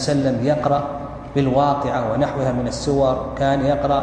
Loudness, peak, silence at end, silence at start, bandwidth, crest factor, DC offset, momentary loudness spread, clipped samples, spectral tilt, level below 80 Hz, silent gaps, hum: -20 LUFS; -4 dBFS; 0 s; 0 s; 10 kHz; 14 dB; under 0.1%; 5 LU; under 0.1%; -6.5 dB/octave; -38 dBFS; none; none